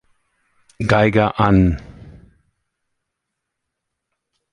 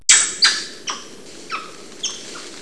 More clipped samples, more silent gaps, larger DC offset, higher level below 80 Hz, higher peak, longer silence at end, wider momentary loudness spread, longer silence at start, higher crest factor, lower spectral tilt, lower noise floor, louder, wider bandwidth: neither; neither; second, under 0.1% vs 0.8%; first, -36 dBFS vs -66 dBFS; about the same, -2 dBFS vs 0 dBFS; first, 2.45 s vs 0 s; second, 10 LU vs 23 LU; first, 0.8 s vs 0.1 s; about the same, 20 dB vs 22 dB; first, -8 dB/octave vs 2.5 dB/octave; first, -79 dBFS vs -39 dBFS; about the same, -16 LUFS vs -17 LUFS; about the same, 10 kHz vs 11 kHz